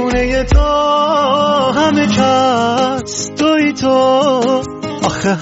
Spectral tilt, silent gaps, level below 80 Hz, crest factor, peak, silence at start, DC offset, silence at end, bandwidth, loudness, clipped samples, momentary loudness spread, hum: -4 dB/octave; none; -24 dBFS; 12 dB; 0 dBFS; 0 s; under 0.1%; 0 s; 8 kHz; -13 LUFS; under 0.1%; 7 LU; none